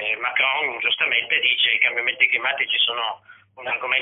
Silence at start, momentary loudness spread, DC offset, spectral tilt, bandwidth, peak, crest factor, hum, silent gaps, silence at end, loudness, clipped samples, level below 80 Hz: 0 s; 10 LU; under 0.1%; -4.5 dB/octave; 4 kHz; -4 dBFS; 18 dB; none; none; 0 s; -19 LUFS; under 0.1%; -70 dBFS